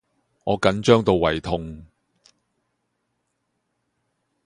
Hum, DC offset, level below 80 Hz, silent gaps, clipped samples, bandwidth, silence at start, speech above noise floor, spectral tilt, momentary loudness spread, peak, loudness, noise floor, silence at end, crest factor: none; under 0.1%; -46 dBFS; none; under 0.1%; 11 kHz; 0.45 s; 55 dB; -6 dB/octave; 14 LU; -2 dBFS; -20 LUFS; -75 dBFS; 2.6 s; 24 dB